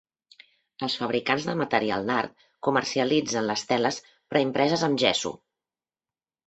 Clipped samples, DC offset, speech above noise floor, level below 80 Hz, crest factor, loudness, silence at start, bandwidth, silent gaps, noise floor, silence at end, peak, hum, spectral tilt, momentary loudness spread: under 0.1%; under 0.1%; over 65 dB; -66 dBFS; 22 dB; -26 LUFS; 0.8 s; 8.4 kHz; none; under -90 dBFS; 1.1 s; -4 dBFS; none; -4 dB/octave; 8 LU